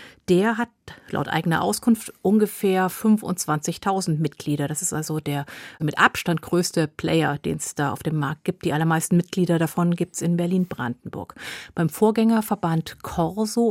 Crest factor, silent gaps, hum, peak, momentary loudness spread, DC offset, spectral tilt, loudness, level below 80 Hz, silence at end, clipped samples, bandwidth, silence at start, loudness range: 22 dB; none; none; 0 dBFS; 9 LU; under 0.1%; -5.5 dB/octave; -23 LUFS; -56 dBFS; 0 s; under 0.1%; 16.5 kHz; 0 s; 2 LU